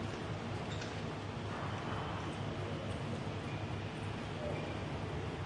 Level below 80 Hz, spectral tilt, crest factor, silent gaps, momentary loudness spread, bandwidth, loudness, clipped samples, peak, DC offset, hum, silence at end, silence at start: -56 dBFS; -6 dB/octave; 14 dB; none; 2 LU; 11 kHz; -41 LUFS; under 0.1%; -26 dBFS; under 0.1%; none; 0 s; 0 s